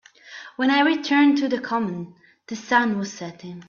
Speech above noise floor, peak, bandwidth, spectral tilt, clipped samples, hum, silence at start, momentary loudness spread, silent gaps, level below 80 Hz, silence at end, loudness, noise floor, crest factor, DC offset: 21 dB; -4 dBFS; 7.2 kHz; -4.5 dB/octave; under 0.1%; none; 0.25 s; 20 LU; none; -70 dBFS; 0.05 s; -21 LUFS; -43 dBFS; 18 dB; under 0.1%